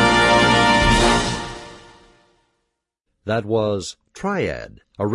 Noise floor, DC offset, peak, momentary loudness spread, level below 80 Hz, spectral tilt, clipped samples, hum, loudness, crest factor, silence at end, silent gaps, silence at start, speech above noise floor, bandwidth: -76 dBFS; under 0.1%; -2 dBFS; 20 LU; -34 dBFS; -4 dB/octave; under 0.1%; none; -18 LUFS; 18 dB; 0 s; none; 0 s; 52 dB; 11.5 kHz